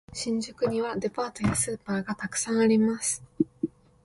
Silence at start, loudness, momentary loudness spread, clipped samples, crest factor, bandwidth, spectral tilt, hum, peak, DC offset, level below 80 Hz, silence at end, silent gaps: 0.1 s; -28 LUFS; 9 LU; under 0.1%; 18 dB; 11.5 kHz; -4.5 dB/octave; none; -10 dBFS; under 0.1%; -54 dBFS; 0.35 s; none